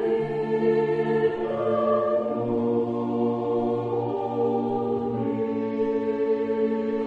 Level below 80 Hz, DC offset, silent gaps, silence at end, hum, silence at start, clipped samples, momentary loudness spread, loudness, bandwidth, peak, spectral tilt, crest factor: -60 dBFS; under 0.1%; none; 0 s; none; 0 s; under 0.1%; 4 LU; -25 LUFS; 4.8 kHz; -12 dBFS; -9 dB/octave; 12 dB